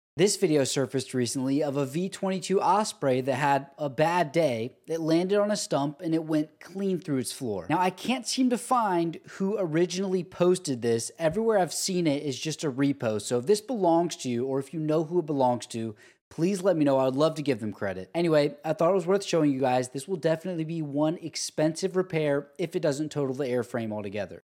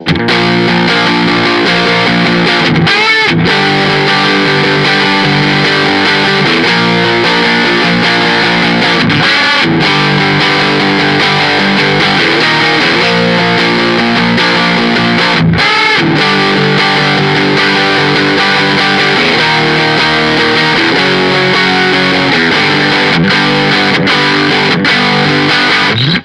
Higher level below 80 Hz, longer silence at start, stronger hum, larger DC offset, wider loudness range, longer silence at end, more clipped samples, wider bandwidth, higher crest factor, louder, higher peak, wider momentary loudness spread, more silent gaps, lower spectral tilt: second, -70 dBFS vs -42 dBFS; first, 0.15 s vs 0 s; neither; neither; about the same, 2 LU vs 0 LU; about the same, 0.05 s vs 0 s; neither; first, 16.5 kHz vs 12 kHz; first, 18 dB vs 8 dB; second, -27 LUFS vs -8 LUFS; second, -10 dBFS vs 0 dBFS; first, 8 LU vs 1 LU; first, 16.21-16.31 s vs none; about the same, -5 dB/octave vs -4.5 dB/octave